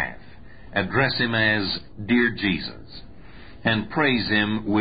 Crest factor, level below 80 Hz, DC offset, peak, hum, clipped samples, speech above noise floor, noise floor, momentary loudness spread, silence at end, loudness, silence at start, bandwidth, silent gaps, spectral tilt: 16 dB; -48 dBFS; 0.7%; -8 dBFS; none; under 0.1%; 23 dB; -46 dBFS; 11 LU; 0 s; -22 LUFS; 0 s; 5 kHz; none; -10 dB/octave